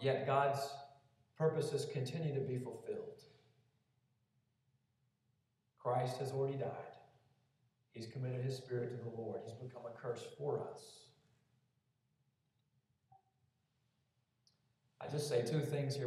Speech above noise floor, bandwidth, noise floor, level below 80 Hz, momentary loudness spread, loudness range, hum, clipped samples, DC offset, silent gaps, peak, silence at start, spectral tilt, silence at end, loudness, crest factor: 42 dB; 14 kHz; -82 dBFS; -86 dBFS; 17 LU; 8 LU; none; under 0.1%; under 0.1%; none; -20 dBFS; 0 s; -6 dB/octave; 0 s; -41 LUFS; 22 dB